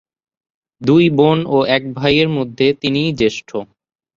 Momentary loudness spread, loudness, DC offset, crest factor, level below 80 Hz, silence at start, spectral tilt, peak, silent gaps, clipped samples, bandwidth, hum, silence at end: 10 LU; -15 LUFS; under 0.1%; 14 dB; -48 dBFS; 0.8 s; -6.5 dB/octave; -2 dBFS; none; under 0.1%; 7.4 kHz; none; 0.5 s